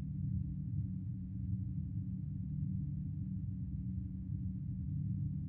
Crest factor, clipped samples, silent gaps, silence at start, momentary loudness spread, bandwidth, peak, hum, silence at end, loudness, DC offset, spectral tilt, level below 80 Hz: 12 dB; under 0.1%; none; 0 s; 3 LU; 0.9 kHz; -26 dBFS; none; 0 s; -41 LUFS; under 0.1%; -17 dB/octave; -50 dBFS